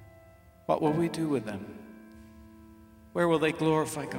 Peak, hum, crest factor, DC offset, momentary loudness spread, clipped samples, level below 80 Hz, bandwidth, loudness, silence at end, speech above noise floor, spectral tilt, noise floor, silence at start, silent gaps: -12 dBFS; none; 20 dB; under 0.1%; 20 LU; under 0.1%; -60 dBFS; 16.5 kHz; -29 LUFS; 0 s; 27 dB; -6 dB/octave; -55 dBFS; 0 s; none